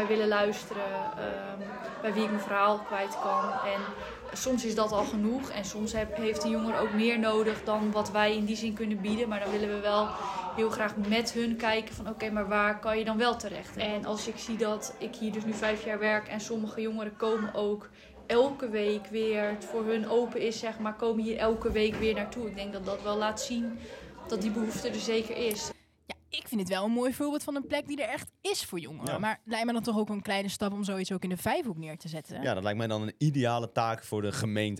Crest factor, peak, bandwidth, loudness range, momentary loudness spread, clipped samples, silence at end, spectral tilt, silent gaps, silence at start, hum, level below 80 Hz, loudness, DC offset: 18 dB; -12 dBFS; 16 kHz; 4 LU; 9 LU; under 0.1%; 0 s; -4.5 dB/octave; none; 0 s; none; -56 dBFS; -31 LUFS; under 0.1%